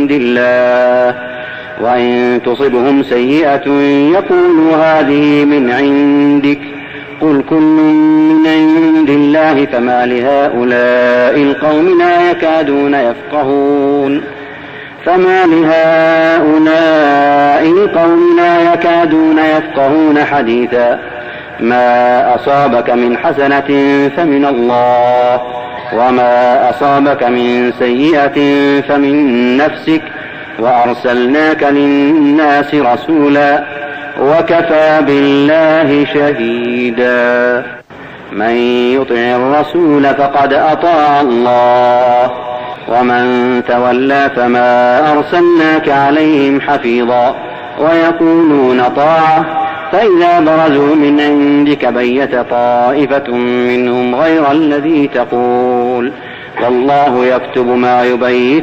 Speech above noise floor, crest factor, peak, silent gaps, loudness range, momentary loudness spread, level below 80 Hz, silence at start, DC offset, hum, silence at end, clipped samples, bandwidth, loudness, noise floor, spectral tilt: 21 dB; 8 dB; 0 dBFS; none; 3 LU; 7 LU; -50 dBFS; 0 s; under 0.1%; none; 0 s; under 0.1%; 7.2 kHz; -9 LUFS; -30 dBFS; -7 dB/octave